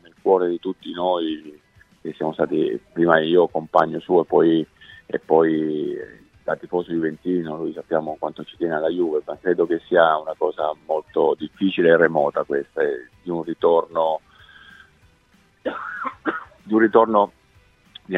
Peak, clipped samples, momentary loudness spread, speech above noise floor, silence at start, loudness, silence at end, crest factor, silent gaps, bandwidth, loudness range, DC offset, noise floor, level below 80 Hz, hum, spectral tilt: 0 dBFS; under 0.1%; 13 LU; 38 dB; 0.25 s; -21 LUFS; 0 s; 22 dB; none; 5.2 kHz; 6 LU; under 0.1%; -58 dBFS; -62 dBFS; none; -8 dB/octave